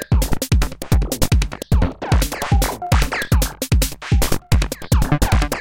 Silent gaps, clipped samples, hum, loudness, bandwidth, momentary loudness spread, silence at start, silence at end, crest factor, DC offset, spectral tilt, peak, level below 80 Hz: none; under 0.1%; none; -19 LUFS; 17 kHz; 2 LU; 0 s; 0 s; 16 dB; under 0.1%; -5 dB/octave; -2 dBFS; -20 dBFS